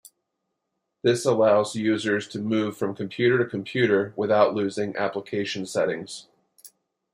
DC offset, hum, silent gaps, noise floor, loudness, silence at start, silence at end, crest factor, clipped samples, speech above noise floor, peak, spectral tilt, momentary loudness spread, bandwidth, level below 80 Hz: under 0.1%; none; none; -80 dBFS; -24 LUFS; 1.05 s; 0.45 s; 20 dB; under 0.1%; 56 dB; -6 dBFS; -5.5 dB/octave; 8 LU; 15.5 kHz; -70 dBFS